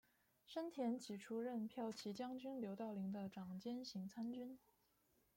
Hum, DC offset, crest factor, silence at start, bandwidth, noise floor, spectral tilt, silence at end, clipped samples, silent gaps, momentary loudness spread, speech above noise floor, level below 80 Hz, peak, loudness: none; under 0.1%; 16 dB; 0.5 s; 16.5 kHz; -81 dBFS; -6 dB/octave; 0.8 s; under 0.1%; none; 6 LU; 33 dB; -86 dBFS; -34 dBFS; -49 LUFS